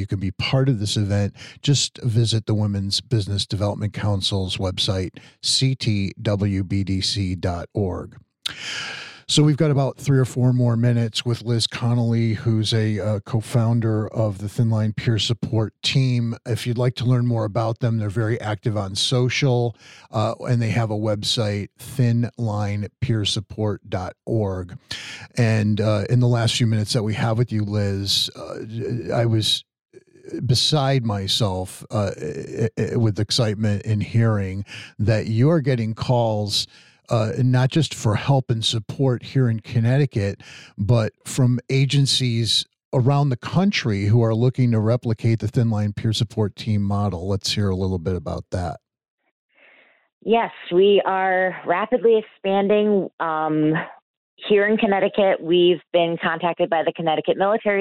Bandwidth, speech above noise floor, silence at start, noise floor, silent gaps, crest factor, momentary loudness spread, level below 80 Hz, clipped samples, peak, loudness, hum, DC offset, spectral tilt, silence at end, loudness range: 13 kHz; 34 dB; 0 s; -54 dBFS; 29.81-29.85 s, 42.85-42.91 s, 49.10-49.18 s, 49.31-49.49 s, 50.12-50.21 s, 53.13-53.18 s, 54.02-54.37 s; 16 dB; 9 LU; -52 dBFS; under 0.1%; -6 dBFS; -21 LUFS; none; under 0.1%; -5.5 dB/octave; 0 s; 4 LU